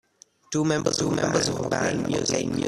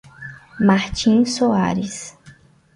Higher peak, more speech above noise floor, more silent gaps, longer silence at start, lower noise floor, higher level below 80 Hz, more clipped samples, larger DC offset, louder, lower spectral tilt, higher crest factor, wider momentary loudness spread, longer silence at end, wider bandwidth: second, -8 dBFS vs -4 dBFS; second, 21 dB vs 31 dB; neither; first, 0.5 s vs 0.2 s; about the same, -45 dBFS vs -48 dBFS; second, -54 dBFS vs -44 dBFS; neither; neither; second, -25 LUFS vs -18 LUFS; second, -4 dB/octave vs -5.5 dB/octave; about the same, 18 dB vs 16 dB; second, 2 LU vs 20 LU; second, 0 s vs 0.45 s; first, 13.5 kHz vs 11.5 kHz